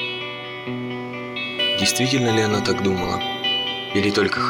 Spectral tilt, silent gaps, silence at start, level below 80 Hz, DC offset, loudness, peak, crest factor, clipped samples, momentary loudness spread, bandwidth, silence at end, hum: -3.5 dB/octave; none; 0 s; -52 dBFS; under 0.1%; -21 LUFS; -6 dBFS; 16 dB; under 0.1%; 11 LU; over 20 kHz; 0 s; none